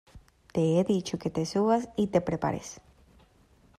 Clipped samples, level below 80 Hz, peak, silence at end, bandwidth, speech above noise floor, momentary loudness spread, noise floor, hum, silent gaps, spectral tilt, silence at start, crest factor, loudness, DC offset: under 0.1%; -58 dBFS; -10 dBFS; 1.05 s; 13.5 kHz; 34 dB; 8 LU; -61 dBFS; none; none; -6.5 dB/octave; 0.15 s; 18 dB; -28 LUFS; under 0.1%